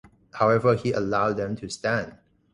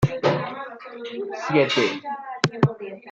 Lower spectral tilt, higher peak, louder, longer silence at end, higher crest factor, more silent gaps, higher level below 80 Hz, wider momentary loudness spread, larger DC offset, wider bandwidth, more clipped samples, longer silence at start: about the same, -6 dB/octave vs -6 dB/octave; second, -8 dBFS vs -2 dBFS; about the same, -24 LUFS vs -23 LUFS; first, 0.4 s vs 0 s; about the same, 18 dB vs 22 dB; neither; about the same, -54 dBFS vs -54 dBFS; second, 10 LU vs 15 LU; neither; first, 11 kHz vs 8.8 kHz; neither; first, 0.35 s vs 0 s